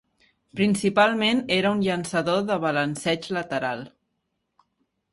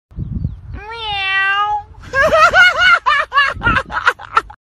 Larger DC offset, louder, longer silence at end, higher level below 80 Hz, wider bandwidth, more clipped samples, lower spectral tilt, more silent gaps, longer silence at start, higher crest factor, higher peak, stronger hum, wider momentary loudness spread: neither; second, -23 LUFS vs -13 LUFS; first, 1.25 s vs 0.1 s; second, -62 dBFS vs -34 dBFS; second, 11.5 kHz vs 13.5 kHz; neither; first, -5 dB/octave vs -3.5 dB/octave; neither; first, 0.55 s vs 0.15 s; first, 20 dB vs 14 dB; second, -6 dBFS vs 0 dBFS; neither; second, 8 LU vs 17 LU